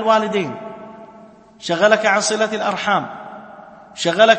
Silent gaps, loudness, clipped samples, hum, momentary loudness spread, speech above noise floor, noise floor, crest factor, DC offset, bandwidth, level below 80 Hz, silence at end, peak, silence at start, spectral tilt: none; -18 LUFS; under 0.1%; none; 23 LU; 27 dB; -44 dBFS; 18 dB; under 0.1%; 8.8 kHz; -64 dBFS; 0 s; 0 dBFS; 0 s; -3 dB/octave